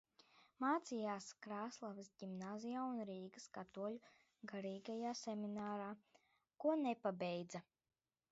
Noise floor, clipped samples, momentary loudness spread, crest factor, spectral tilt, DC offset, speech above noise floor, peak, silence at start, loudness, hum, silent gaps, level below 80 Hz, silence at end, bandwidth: under -90 dBFS; under 0.1%; 13 LU; 20 dB; -5 dB/octave; under 0.1%; over 45 dB; -28 dBFS; 0.35 s; -46 LUFS; none; none; -90 dBFS; 0.7 s; 7.6 kHz